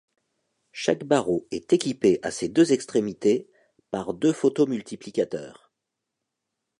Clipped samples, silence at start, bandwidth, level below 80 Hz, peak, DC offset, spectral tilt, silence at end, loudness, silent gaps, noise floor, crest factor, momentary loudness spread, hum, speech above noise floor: under 0.1%; 0.75 s; 11 kHz; -64 dBFS; -6 dBFS; under 0.1%; -5.5 dB/octave; 1.25 s; -24 LUFS; none; -83 dBFS; 18 dB; 11 LU; none; 60 dB